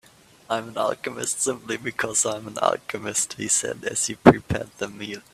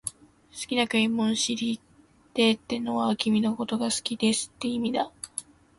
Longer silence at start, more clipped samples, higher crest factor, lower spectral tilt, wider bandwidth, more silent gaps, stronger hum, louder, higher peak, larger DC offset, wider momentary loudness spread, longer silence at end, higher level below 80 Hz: first, 0.5 s vs 0.05 s; neither; first, 24 dB vs 18 dB; about the same, -3.5 dB/octave vs -3.5 dB/octave; first, 15.5 kHz vs 11.5 kHz; neither; neither; first, -23 LUFS vs -27 LUFS; first, 0 dBFS vs -10 dBFS; neither; about the same, 13 LU vs 13 LU; second, 0.15 s vs 0.4 s; first, -52 dBFS vs -64 dBFS